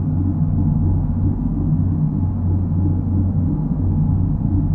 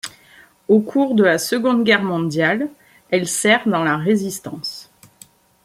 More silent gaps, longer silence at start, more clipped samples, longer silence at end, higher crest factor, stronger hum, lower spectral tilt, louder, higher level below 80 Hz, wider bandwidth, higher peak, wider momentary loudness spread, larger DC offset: neither; about the same, 0 s vs 0.05 s; neither; second, 0 s vs 0.8 s; second, 12 dB vs 18 dB; neither; first, -14 dB/octave vs -4.5 dB/octave; about the same, -19 LUFS vs -18 LUFS; first, -28 dBFS vs -64 dBFS; second, 1.7 kHz vs 16 kHz; second, -6 dBFS vs -2 dBFS; second, 2 LU vs 13 LU; first, 0.1% vs under 0.1%